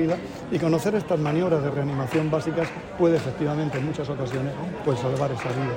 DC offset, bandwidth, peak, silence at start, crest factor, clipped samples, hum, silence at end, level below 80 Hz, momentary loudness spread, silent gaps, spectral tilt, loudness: under 0.1%; 16 kHz; -8 dBFS; 0 s; 16 dB; under 0.1%; none; 0 s; -52 dBFS; 6 LU; none; -7.5 dB/octave; -25 LUFS